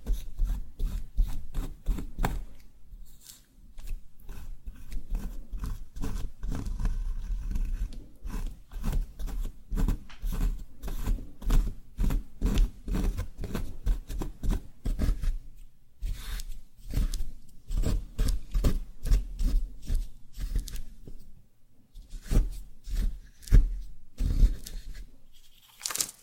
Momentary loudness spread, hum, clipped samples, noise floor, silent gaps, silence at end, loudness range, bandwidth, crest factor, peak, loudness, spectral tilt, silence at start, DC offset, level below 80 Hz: 18 LU; none; under 0.1%; -54 dBFS; none; 0.1 s; 8 LU; 16.5 kHz; 26 dB; -4 dBFS; -35 LUFS; -5 dB/octave; 0 s; under 0.1%; -30 dBFS